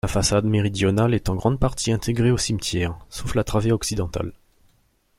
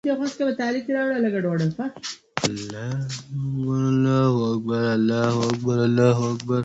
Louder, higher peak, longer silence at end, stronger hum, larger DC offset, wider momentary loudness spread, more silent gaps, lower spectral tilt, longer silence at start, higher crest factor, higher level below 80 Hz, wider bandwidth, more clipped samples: about the same, -22 LUFS vs -23 LUFS; about the same, -4 dBFS vs -4 dBFS; first, 0.85 s vs 0 s; neither; neither; about the same, 8 LU vs 10 LU; neither; about the same, -5.5 dB/octave vs -6.5 dB/octave; about the same, 0.05 s vs 0.05 s; about the same, 18 dB vs 18 dB; first, -36 dBFS vs -58 dBFS; first, 16 kHz vs 8.2 kHz; neither